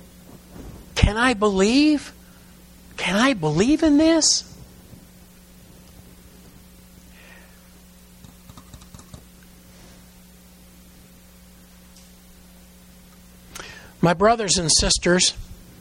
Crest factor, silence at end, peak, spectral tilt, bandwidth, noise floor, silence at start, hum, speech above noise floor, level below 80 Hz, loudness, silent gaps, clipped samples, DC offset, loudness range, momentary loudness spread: 24 dB; 0.25 s; 0 dBFS; -3.5 dB/octave; 16.5 kHz; -48 dBFS; 0.35 s; none; 30 dB; -38 dBFS; -18 LUFS; none; under 0.1%; under 0.1%; 9 LU; 24 LU